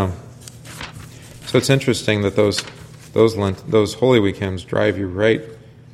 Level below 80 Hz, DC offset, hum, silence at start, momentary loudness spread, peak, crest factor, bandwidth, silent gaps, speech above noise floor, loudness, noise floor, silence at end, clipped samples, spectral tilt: -48 dBFS; under 0.1%; none; 0 s; 21 LU; 0 dBFS; 18 dB; 14.5 kHz; none; 21 dB; -18 LUFS; -38 dBFS; 0.35 s; under 0.1%; -5.5 dB/octave